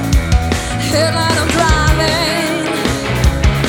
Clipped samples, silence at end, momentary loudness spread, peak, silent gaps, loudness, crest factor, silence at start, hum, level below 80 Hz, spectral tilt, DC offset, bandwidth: under 0.1%; 0 s; 4 LU; 0 dBFS; none; -14 LUFS; 14 dB; 0 s; none; -18 dBFS; -4.5 dB/octave; under 0.1%; 18.5 kHz